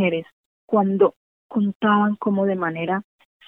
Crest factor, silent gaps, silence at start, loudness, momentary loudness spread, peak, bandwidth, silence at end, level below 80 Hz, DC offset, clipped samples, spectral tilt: 18 dB; 0.32-0.68 s, 1.16-1.50 s, 1.75-1.80 s; 0 s; -22 LUFS; 8 LU; -4 dBFS; 3.6 kHz; 0.45 s; -74 dBFS; under 0.1%; under 0.1%; -10 dB/octave